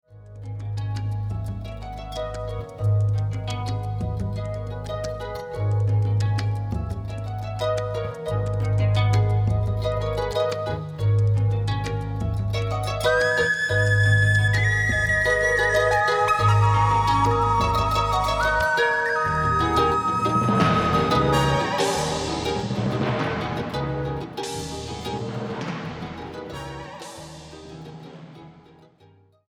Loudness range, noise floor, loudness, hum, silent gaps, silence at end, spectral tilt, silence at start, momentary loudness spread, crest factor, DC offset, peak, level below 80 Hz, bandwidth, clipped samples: 11 LU; -55 dBFS; -23 LUFS; none; none; 0.9 s; -5.5 dB/octave; 0.1 s; 15 LU; 16 dB; under 0.1%; -6 dBFS; -38 dBFS; 13 kHz; under 0.1%